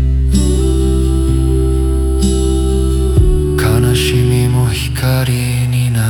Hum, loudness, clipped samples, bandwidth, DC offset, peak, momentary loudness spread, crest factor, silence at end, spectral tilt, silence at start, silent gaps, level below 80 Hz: none; -13 LUFS; under 0.1%; 18 kHz; under 0.1%; 0 dBFS; 3 LU; 12 dB; 0 s; -6 dB/octave; 0 s; none; -16 dBFS